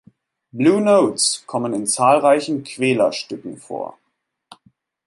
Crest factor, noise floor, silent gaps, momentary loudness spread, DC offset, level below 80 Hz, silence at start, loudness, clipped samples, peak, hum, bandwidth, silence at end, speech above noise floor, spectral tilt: 18 dB; -74 dBFS; none; 16 LU; under 0.1%; -68 dBFS; 0.55 s; -17 LUFS; under 0.1%; -2 dBFS; none; 12 kHz; 1.15 s; 56 dB; -4 dB/octave